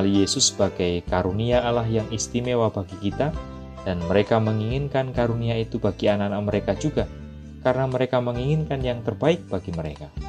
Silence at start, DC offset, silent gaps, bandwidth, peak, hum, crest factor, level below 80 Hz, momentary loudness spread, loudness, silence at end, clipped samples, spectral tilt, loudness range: 0 s; under 0.1%; none; 11.5 kHz; -6 dBFS; none; 18 dB; -40 dBFS; 9 LU; -24 LUFS; 0 s; under 0.1%; -5 dB/octave; 2 LU